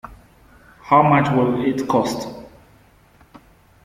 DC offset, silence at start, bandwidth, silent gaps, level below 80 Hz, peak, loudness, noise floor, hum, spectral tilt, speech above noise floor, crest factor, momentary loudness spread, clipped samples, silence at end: under 0.1%; 0.1 s; 16 kHz; none; -52 dBFS; -2 dBFS; -18 LUFS; -52 dBFS; none; -7 dB/octave; 35 dB; 20 dB; 16 LU; under 0.1%; 1.35 s